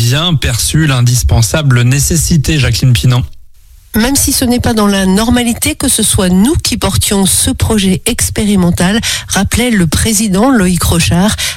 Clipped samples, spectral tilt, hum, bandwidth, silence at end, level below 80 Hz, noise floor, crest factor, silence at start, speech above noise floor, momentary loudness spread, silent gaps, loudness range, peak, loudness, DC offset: under 0.1%; -4 dB/octave; none; 17 kHz; 0 s; -22 dBFS; -37 dBFS; 10 dB; 0 s; 27 dB; 3 LU; none; 1 LU; 0 dBFS; -10 LUFS; under 0.1%